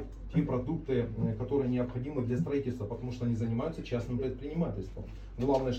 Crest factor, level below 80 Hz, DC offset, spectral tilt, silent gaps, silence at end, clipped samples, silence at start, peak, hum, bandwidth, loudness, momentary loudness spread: 16 dB; -46 dBFS; under 0.1%; -9 dB/octave; none; 0 s; under 0.1%; 0 s; -16 dBFS; none; 8.2 kHz; -33 LUFS; 7 LU